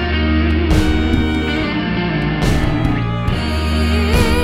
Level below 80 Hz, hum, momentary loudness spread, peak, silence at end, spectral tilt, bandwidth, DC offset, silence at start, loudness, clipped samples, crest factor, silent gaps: -20 dBFS; none; 3 LU; 0 dBFS; 0 s; -6.5 dB/octave; 14.5 kHz; 0.3%; 0 s; -17 LUFS; under 0.1%; 14 dB; none